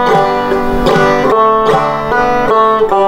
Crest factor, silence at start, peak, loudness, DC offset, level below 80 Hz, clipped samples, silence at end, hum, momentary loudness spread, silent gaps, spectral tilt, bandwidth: 10 dB; 0 s; 0 dBFS; -10 LUFS; under 0.1%; -28 dBFS; under 0.1%; 0 s; none; 3 LU; none; -6 dB/octave; 16 kHz